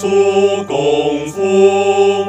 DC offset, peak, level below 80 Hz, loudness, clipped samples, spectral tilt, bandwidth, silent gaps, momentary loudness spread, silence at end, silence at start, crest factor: under 0.1%; 0 dBFS; -54 dBFS; -13 LUFS; under 0.1%; -5 dB/octave; 9.2 kHz; none; 6 LU; 0 s; 0 s; 12 dB